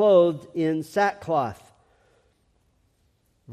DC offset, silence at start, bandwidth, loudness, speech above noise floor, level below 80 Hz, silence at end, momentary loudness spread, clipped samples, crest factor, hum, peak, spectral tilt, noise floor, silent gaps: under 0.1%; 0 s; 14 kHz; -24 LUFS; 45 dB; -66 dBFS; 0 s; 11 LU; under 0.1%; 18 dB; none; -6 dBFS; -6.5 dB/octave; -67 dBFS; none